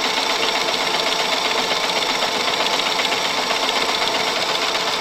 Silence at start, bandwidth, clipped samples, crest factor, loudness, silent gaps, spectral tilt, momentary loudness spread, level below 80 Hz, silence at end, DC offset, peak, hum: 0 s; 16.5 kHz; under 0.1%; 16 dB; -18 LUFS; none; -1 dB/octave; 1 LU; -56 dBFS; 0 s; under 0.1%; -4 dBFS; none